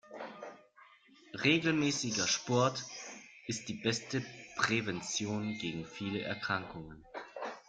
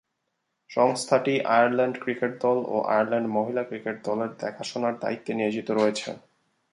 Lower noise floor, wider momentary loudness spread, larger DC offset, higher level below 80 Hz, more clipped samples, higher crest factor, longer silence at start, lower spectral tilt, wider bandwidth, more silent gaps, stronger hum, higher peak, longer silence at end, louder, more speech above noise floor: second, -62 dBFS vs -78 dBFS; first, 18 LU vs 10 LU; neither; first, -68 dBFS vs -74 dBFS; neither; about the same, 22 dB vs 20 dB; second, 0.05 s vs 0.7 s; second, -3.5 dB/octave vs -5 dB/octave; second, 10 kHz vs 11.5 kHz; neither; neither; second, -14 dBFS vs -6 dBFS; second, 0.1 s vs 0.55 s; second, -34 LUFS vs -26 LUFS; second, 27 dB vs 53 dB